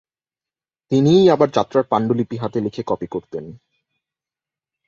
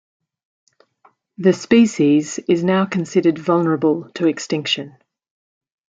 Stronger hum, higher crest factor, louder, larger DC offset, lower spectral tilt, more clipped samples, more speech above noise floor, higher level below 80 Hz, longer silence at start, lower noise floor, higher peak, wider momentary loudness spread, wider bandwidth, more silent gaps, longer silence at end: neither; about the same, 18 dB vs 18 dB; about the same, -18 LUFS vs -18 LUFS; neither; first, -7.5 dB/octave vs -5.5 dB/octave; neither; first, over 72 dB vs 40 dB; first, -58 dBFS vs -64 dBFS; second, 0.9 s vs 1.4 s; first, under -90 dBFS vs -57 dBFS; about the same, -2 dBFS vs -2 dBFS; first, 15 LU vs 7 LU; second, 7.2 kHz vs 9 kHz; neither; first, 1.3 s vs 1 s